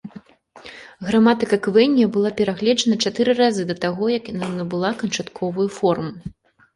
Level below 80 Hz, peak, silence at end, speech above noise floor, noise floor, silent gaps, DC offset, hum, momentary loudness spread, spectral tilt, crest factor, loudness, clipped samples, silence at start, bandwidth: -56 dBFS; -4 dBFS; 0.45 s; 26 dB; -45 dBFS; none; under 0.1%; none; 16 LU; -5 dB/octave; 16 dB; -20 LUFS; under 0.1%; 0.05 s; 11.5 kHz